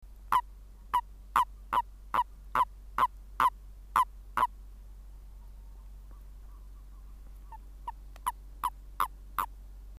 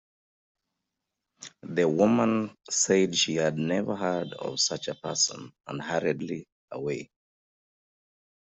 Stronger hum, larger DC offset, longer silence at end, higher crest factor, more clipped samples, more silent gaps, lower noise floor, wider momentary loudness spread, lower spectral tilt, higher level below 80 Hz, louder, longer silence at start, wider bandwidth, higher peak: neither; neither; second, 0 s vs 1.5 s; about the same, 24 dB vs 20 dB; neither; second, none vs 6.52-6.68 s; second, -49 dBFS vs -85 dBFS; first, 22 LU vs 16 LU; about the same, -3 dB/octave vs -3.5 dB/octave; first, -48 dBFS vs -70 dBFS; second, -32 LUFS vs -27 LUFS; second, 0.05 s vs 1.4 s; first, 15.5 kHz vs 8.2 kHz; about the same, -10 dBFS vs -8 dBFS